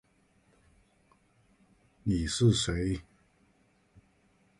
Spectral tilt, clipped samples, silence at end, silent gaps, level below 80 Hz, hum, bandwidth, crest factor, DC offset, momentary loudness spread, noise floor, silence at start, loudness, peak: -5 dB/octave; under 0.1%; 1.6 s; none; -48 dBFS; none; 11.5 kHz; 22 dB; under 0.1%; 12 LU; -68 dBFS; 2.05 s; -30 LUFS; -14 dBFS